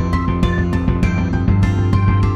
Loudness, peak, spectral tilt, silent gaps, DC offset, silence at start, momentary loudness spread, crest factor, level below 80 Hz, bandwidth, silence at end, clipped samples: -17 LUFS; -2 dBFS; -8 dB/octave; none; under 0.1%; 0 s; 3 LU; 12 dB; -22 dBFS; 8 kHz; 0 s; under 0.1%